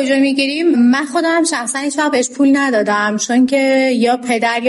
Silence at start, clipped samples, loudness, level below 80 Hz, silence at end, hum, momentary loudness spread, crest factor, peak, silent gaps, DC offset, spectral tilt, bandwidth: 0 s; under 0.1%; -14 LUFS; -66 dBFS; 0 s; none; 3 LU; 10 dB; -4 dBFS; none; under 0.1%; -3 dB/octave; 11.5 kHz